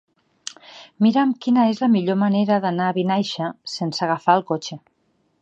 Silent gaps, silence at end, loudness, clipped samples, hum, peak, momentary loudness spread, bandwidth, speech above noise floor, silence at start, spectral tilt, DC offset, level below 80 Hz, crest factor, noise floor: none; 0.65 s; -20 LUFS; under 0.1%; none; -2 dBFS; 17 LU; 8.6 kHz; 47 dB; 0.7 s; -6 dB/octave; under 0.1%; -72 dBFS; 18 dB; -66 dBFS